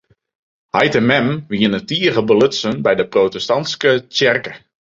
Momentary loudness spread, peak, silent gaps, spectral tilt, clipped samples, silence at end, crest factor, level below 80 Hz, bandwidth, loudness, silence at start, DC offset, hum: 5 LU; -2 dBFS; none; -5 dB/octave; under 0.1%; 0.35 s; 16 dB; -54 dBFS; 7.8 kHz; -16 LUFS; 0.75 s; under 0.1%; none